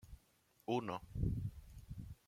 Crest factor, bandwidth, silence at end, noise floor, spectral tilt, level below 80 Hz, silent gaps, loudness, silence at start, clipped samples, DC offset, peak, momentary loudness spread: 20 dB; 16 kHz; 0.15 s; -74 dBFS; -7.5 dB/octave; -52 dBFS; none; -43 LUFS; 0.05 s; under 0.1%; under 0.1%; -24 dBFS; 19 LU